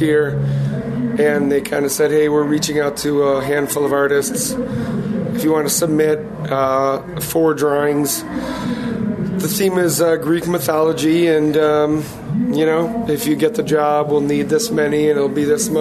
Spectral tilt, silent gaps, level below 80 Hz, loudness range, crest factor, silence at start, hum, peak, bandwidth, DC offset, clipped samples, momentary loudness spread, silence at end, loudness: -5 dB/octave; none; -46 dBFS; 2 LU; 12 dB; 0 s; none; -4 dBFS; 14 kHz; under 0.1%; under 0.1%; 6 LU; 0 s; -17 LUFS